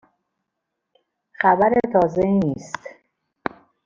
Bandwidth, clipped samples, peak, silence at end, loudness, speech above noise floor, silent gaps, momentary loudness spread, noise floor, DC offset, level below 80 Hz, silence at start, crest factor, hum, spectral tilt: 7.6 kHz; under 0.1%; -4 dBFS; 0.95 s; -19 LUFS; 61 dB; none; 15 LU; -80 dBFS; under 0.1%; -54 dBFS; 1.4 s; 20 dB; none; -7.5 dB/octave